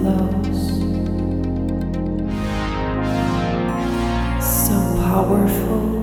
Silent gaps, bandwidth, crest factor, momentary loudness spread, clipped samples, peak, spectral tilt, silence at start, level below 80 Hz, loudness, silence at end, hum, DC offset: none; 19.5 kHz; 14 dB; 6 LU; under 0.1%; -4 dBFS; -6 dB/octave; 0 s; -28 dBFS; -20 LUFS; 0 s; none; under 0.1%